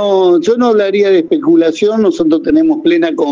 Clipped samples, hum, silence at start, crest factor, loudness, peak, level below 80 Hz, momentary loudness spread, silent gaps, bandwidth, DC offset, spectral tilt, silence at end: under 0.1%; none; 0 s; 10 dB; -11 LUFS; 0 dBFS; -52 dBFS; 2 LU; none; 7.4 kHz; under 0.1%; -6 dB/octave; 0 s